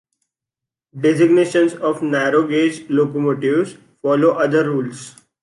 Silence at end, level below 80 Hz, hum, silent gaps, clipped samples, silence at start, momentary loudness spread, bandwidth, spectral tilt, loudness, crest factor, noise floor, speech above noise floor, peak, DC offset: 0.35 s; -68 dBFS; none; none; under 0.1%; 0.95 s; 9 LU; 11.5 kHz; -6.5 dB/octave; -17 LUFS; 14 dB; -86 dBFS; 69 dB; -2 dBFS; under 0.1%